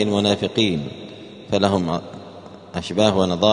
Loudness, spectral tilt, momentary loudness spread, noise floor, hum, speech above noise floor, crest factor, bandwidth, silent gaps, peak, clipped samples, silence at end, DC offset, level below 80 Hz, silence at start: -20 LUFS; -5.5 dB/octave; 20 LU; -40 dBFS; none; 20 dB; 20 dB; 10.5 kHz; none; 0 dBFS; under 0.1%; 0 s; under 0.1%; -52 dBFS; 0 s